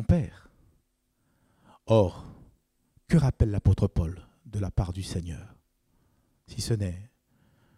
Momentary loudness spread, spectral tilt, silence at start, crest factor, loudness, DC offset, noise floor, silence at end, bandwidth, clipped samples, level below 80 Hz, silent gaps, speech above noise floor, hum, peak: 19 LU; -7.5 dB/octave; 0 s; 20 dB; -28 LUFS; under 0.1%; -73 dBFS; 0.7 s; 13 kHz; under 0.1%; -40 dBFS; none; 47 dB; none; -8 dBFS